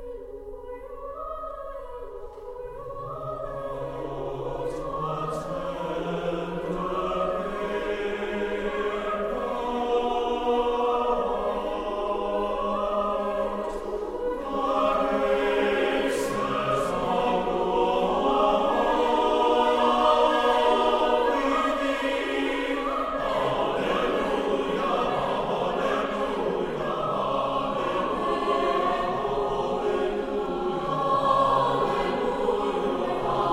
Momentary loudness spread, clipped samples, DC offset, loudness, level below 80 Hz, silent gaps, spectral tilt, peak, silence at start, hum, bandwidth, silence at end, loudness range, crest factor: 11 LU; under 0.1%; under 0.1%; -26 LUFS; -46 dBFS; none; -5.5 dB/octave; -8 dBFS; 0 s; none; 15.5 kHz; 0 s; 9 LU; 18 dB